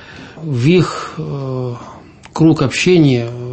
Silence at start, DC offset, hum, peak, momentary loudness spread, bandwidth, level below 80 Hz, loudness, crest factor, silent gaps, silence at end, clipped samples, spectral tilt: 0 s; under 0.1%; none; 0 dBFS; 18 LU; 8.8 kHz; -48 dBFS; -15 LUFS; 14 dB; none; 0 s; under 0.1%; -6.5 dB/octave